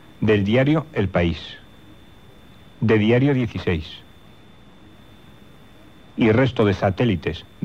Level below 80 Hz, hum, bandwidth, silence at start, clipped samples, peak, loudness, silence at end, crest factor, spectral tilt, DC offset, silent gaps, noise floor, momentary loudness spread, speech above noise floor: -46 dBFS; none; 7.8 kHz; 0.2 s; under 0.1%; -6 dBFS; -20 LUFS; 0.2 s; 16 dB; -8 dB/octave; 0.3%; none; -48 dBFS; 16 LU; 29 dB